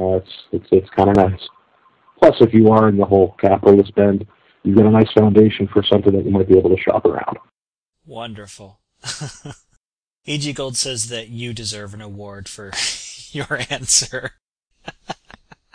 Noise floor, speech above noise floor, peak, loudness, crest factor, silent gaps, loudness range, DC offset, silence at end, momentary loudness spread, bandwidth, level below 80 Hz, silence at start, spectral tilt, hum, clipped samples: -83 dBFS; 67 dB; 0 dBFS; -15 LUFS; 16 dB; 7.61-7.72 s, 7.78-7.86 s, 9.77-10.21 s, 14.41-14.56 s; 12 LU; under 0.1%; 0.6 s; 21 LU; 11 kHz; -48 dBFS; 0 s; -5 dB/octave; none; under 0.1%